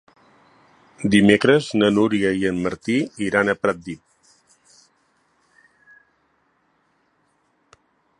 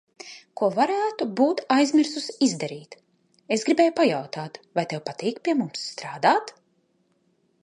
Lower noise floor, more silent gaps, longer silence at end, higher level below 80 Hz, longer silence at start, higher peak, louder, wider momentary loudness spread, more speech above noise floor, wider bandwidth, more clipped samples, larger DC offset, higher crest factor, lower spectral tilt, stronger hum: about the same, -65 dBFS vs -68 dBFS; neither; first, 4.25 s vs 1.15 s; first, -56 dBFS vs -78 dBFS; first, 1 s vs 0.2 s; first, 0 dBFS vs -4 dBFS; first, -19 LUFS vs -24 LUFS; about the same, 13 LU vs 14 LU; about the same, 47 dB vs 44 dB; about the same, 11 kHz vs 10.5 kHz; neither; neither; about the same, 22 dB vs 20 dB; about the same, -5.5 dB/octave vs -4.5 dB/octave; neither